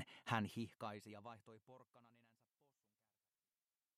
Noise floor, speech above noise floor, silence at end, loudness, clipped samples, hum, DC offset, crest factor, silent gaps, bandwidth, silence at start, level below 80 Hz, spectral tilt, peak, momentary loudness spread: under -90 dBFS; over 41 dB; 1.9 s; -47 LUFS; under 0.1%; none; under 0.1%; 28 dB; none; 15 kHz; 0 s; under -90 dBFS; -5.5 dB/octave; -24 dBFS; 22 LU